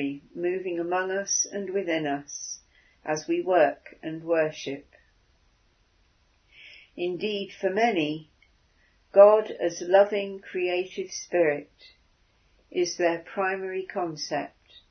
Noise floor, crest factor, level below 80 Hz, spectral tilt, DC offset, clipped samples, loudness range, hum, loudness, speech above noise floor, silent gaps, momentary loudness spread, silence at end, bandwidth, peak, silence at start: -65 dBFS; 24 dB; -70 dBFS; -3.5 dB/octave; under 0.1%; under 0.1%; 9 LU; none; -26 LUFS; 39 dB; none; 15 LU; 0.4 s; 6.6 kHz; -4 dBFS; 0 s